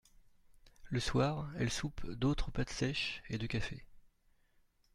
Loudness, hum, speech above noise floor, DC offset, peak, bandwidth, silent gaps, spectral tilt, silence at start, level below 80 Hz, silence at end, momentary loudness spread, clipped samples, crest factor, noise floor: -37 LUFS; none; 35 dB; under 0.1%; -20 dBFS; 12.5 kHz; none; -5 dB/octave; 0.5 s; -48 dBFS; 0.85 s; 7 LU; under 0.1%; 18 dB; -71 dBFS